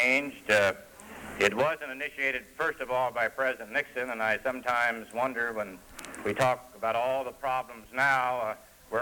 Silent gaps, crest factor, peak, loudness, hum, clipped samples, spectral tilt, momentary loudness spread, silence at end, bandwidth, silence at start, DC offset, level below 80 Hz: none; 22 dB; -6 dBFS; -29 LUFS; none; under 0.1%; -3.5 dB/octave; 12 LU; 0 s; 19 kHz; 0 s; under 0.1%; -62 dBFS